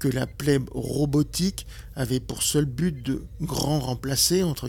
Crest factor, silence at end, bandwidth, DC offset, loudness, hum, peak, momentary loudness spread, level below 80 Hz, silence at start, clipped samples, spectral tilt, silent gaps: 18 dB; 0 s; 18 kHz; under 0.1%; -25 LUFS; none; -8 dBFS; 10 LU; -42 dBFS; 0 s; under 0.1%; -4.5 dB/octave; none